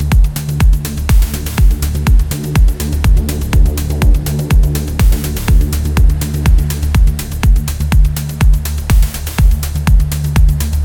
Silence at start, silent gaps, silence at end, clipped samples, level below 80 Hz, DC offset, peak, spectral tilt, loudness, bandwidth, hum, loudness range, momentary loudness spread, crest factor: 0 s; none; 0 s; under 0.1%; -12 dBFS; under 0.1%; 0 dBFS; -5.5 dB/octave; -14 LUFS; 18.5 kHz; none; 0 LU; 3 LU; 10 dB